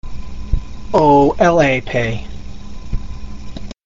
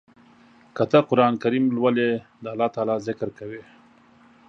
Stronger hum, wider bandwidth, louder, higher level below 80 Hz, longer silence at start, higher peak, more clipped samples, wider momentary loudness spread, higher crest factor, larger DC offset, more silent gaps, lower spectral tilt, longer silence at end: neither; about the same, 7.8 kHz vs 7.4 kHz; first, -15 LUFS vs -22 LUFS; first, -28 dBFS vs -66 dBFS; second, 0 s vs 0.75 s; about the same, 0 dBFS vs -2 dBFS; neither; first, 23 LU vs 18 LU; second, 16 dB vs 22 dB; first, 4% vs under 0.1%; neither; second, -5.5 dB/octave vs -7.5 dB/octave; second, 0 s vs 0.9 s